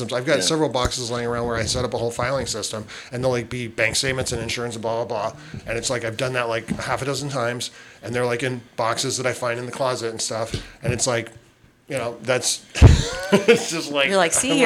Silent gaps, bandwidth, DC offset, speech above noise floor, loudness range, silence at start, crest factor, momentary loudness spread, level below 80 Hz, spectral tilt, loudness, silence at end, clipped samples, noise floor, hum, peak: none; 16 kHz; under 0.1%; 31 dB; 5 LU; 0 s; 20 dB; 11 LU; -32 dBFS; -4 dB/octave; -22 LUFS; 0 s; under 0.1%; -53 dBFS; none; -2 dBFS